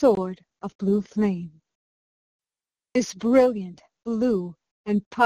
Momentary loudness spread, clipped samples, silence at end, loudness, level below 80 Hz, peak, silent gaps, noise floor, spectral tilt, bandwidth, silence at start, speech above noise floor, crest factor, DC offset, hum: 19 LU; under 0.1%; 0 s; -24 LUFS; -60 dBFS; -6 dBFS; 0.75-0.79 s, 1.75-2.39 s, 4.71-4.84 s, 5.06-5.11 s; under -90 dBFS; -6.5 dB/octave; 12 kHz; 0 s; over 67 dB; 18 dB; under 0.1%; none